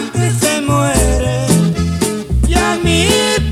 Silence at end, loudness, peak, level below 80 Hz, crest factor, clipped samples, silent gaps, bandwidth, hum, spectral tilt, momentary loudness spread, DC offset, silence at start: 0 s; -13 LUFS; 0 dBFS; -20 dBFS; 14 dB; under 0.1%; none; 16 kHz; none; -4.5 dB/octave; 5 LU; under 0.1%; 0 s